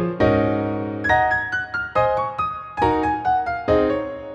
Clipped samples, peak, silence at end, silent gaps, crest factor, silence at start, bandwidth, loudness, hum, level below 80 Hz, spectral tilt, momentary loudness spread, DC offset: under 0.1%; -4 dBFS; 0 s; none; 18 dB; 0 s; 8.4 kHz; -21 LUFS; none; -40 dBFS; -7.5 dB/octave; 6 LU; under 0.1%